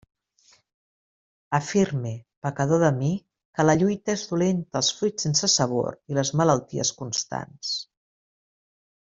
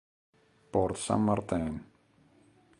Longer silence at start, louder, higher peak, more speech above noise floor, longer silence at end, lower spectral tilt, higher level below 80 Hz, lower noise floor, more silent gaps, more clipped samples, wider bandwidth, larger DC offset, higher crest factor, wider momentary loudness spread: first, 1.5 s vs 0.75 s; first, -24 LUFS vs -31 LUFS; first, -6 dBFS vs -12 dBFS; about the same, 37 dB vs 35 dB; first, 1.25 s vs 0.95 s; second, -4.5 dB/octave vs -6 dB/octave; second, -60 dBFS vs -54 dBFS; about the same, -61 dBFS vs -64 dBFS; first, 2.37-2.42 s, 3.45-3.54 s vs none; neither; second, 7.8 kHz vs 11.5 kHz; neither; about the same, 20 dB vs 22 dB; first, 11 LU vs 8 LU